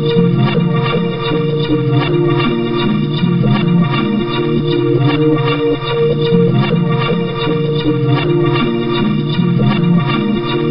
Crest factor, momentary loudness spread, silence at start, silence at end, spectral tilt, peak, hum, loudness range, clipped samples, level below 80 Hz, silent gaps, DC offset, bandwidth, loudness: 12 dB; 3 LU; 0 s; 0 s; -11.5 dB/octave; 0 dBFS; none; 1 LU; under 0.1%; -38 dBFS; none; 1%; 5.6 kHz; -14 LUFS